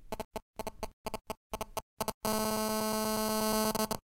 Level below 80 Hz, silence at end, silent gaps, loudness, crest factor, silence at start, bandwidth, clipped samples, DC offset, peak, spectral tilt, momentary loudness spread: -52 dBFS; 0.05 s; 0.25-0.31 s, 0.42-0.53 s, 0.93-1.05 s, 1.37-1.50 s, 1.82-1.97 s, 2.14-2.21 s; -34 LUFS; 20 dB; 0 s; 16.5 kHz; under 0.1%; under 0.1%; -14 dBFS; -3 dB/octave; 13 LU